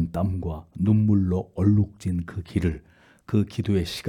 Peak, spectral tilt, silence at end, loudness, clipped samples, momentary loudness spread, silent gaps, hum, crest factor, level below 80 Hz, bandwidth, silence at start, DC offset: -8 dBFS; -8 dB/octave; 0 s; -25 LUFS; under 0.1%; 9 LU; none; none; 16 dB; -46 dBFS; 12.5 kHz; 0 s; under 0.1%